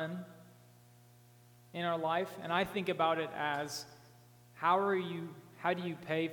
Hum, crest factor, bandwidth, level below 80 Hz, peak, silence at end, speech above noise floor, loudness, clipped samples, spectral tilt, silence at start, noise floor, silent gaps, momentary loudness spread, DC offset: 60 Hz at -60 dBFS; 20 dB; 19 kHz; -76 dBFS; -18 dBFS; 0 s; 26 dB; -35 LUFS; under 0.1%; -5 dB/octave; 0 s; -61 dBFS; none; 14 LU; under 0.1%